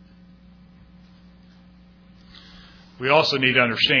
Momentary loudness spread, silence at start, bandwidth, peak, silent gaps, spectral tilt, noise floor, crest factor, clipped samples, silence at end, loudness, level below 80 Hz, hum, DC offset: 3 LU; 3 s; 5.4 kHz; -2 dBFS; none; -4.5 dB/octave; -50 dBFS; 22 dB; under 0.1%; 0 s; -18 LUFS; -56 dBFS; none; under 0.1%